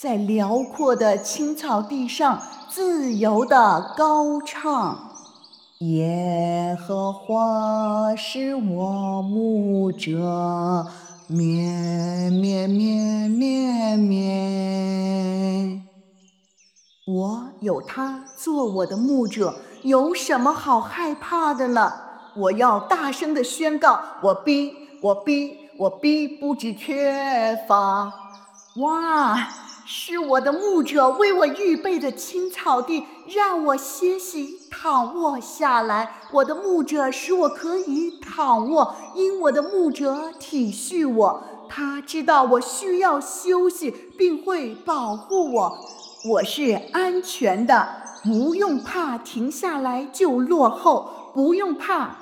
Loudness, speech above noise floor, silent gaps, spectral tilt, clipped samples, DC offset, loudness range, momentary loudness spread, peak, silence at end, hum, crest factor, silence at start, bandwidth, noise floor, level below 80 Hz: -22 LUFS; 39 dB; none; -5.5 dB/octave; under 0.1%; under 0.1%; 3 LU; 10 LU; -2 dBFS; 0 s; none; 20 dB; 0 s; 19 kHz; -60 dBFS; -70 dBFS